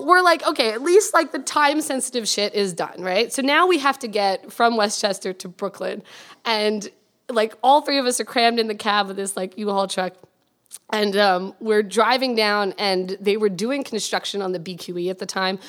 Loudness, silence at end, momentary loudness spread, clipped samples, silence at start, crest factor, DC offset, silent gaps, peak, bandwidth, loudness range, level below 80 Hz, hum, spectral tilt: -21 LUFS; 0 s; 11 LU; under 0.1%; 0 s; 20 dB; under 0.1%; none; -2 dBFS; 17.5 kHz; 3 LU; -80 dBFS; none; -3 dB/octave